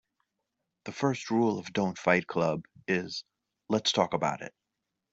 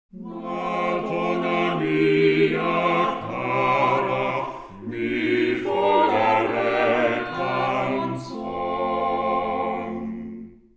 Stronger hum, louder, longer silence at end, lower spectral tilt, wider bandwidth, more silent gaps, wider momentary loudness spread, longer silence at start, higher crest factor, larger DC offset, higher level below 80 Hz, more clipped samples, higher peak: neither; second, -29 LUFS vs -23 LUFS; first, 0.65 s vs 0.25 s; second, -4.5 dB/octave vs -7 dB/octave; about the same, 8 kHz vs 8 kHz; neither; about the same, 14 LU vs 12 LU; first, 0.85 s vs 0.15 s; first, 22 dB vs 16 dB; neither; second, -70 dBFS vs -56 dBFS; neither; about the same, -8 dBFS vs -6 dBFS